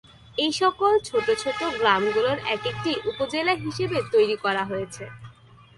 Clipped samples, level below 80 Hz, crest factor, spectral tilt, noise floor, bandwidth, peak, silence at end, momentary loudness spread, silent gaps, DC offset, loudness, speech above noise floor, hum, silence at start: under 0.1%; -58 dBFS; 20 dB; -4 dB/octave; -50 dBFS; 11.5 kHz; -6 dBFS; 0.45 s; 9 LU; none; under 0.1%; -24 LUFS; 26 dB; none; 0.35 s